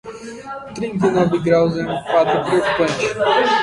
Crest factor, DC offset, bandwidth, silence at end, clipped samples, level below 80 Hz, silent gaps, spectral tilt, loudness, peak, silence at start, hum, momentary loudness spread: 14 dB; under 0.1%; 11.5 kHz; 0 s; under 0.1%; -50 dBFS; none; -5.5 dB/octave; -17 LUFS; -2 dBFS; 0.05 s; none; 15 LU